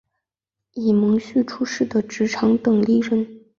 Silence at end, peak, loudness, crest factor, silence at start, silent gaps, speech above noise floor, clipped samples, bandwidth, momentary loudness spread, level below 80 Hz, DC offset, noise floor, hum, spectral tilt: 0.2 s; -6 dBFS; -20 LUFS; 14 dB; 0.75 s; none; 66 dB; under 0.1%; 7.2 kHz; 7 LU; -60 dBFS; under 0.1%; -85 dBFS; none; -6.5 dB/octave